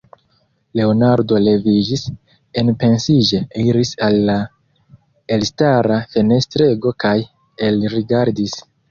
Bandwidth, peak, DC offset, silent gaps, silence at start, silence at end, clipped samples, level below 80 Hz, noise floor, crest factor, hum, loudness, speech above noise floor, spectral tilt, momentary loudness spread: 7.4 kHz; -2 dBFS; under 0.1%; none; 0.75 s; 0.3 s; under 0.1%; -48 dBFS; -61 dBFS; 14 dB; none; -16 LUFS; 46 dB; -6.5 dB/octave; 9 LU